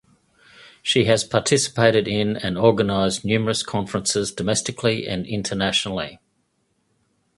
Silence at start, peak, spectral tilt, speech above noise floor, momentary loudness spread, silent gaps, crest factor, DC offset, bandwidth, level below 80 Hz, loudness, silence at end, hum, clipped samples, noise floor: 0.85 s; 0 dBFS; -4 dB/octave; 48 dB; 8 LU; none; 22 dB; under 0.1%; 11.5 kHz; -50 dBFS; -21 LUFS; 1.2 s; none; under 0.1%; -69 dBFS